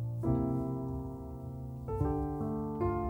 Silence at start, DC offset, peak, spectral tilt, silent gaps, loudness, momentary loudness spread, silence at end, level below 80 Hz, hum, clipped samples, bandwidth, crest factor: 0 s; under 0.1%; -20 dBFS; -11 dB/octave; none; -36 LUFS; 11 LU; 0 s; -44 dBFS; none; under 0.1%; 16.5 kHz; 16 dB